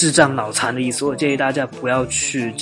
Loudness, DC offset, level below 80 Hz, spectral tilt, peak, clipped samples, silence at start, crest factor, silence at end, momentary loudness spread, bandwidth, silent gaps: -19 LUFS; under 0.1%; -52 dBFS; -3.5 dB/octave; 0 dBFS; under 0.1%; 0 s; 18 dB; 0 s; 5 LU; 11.5 kHz; none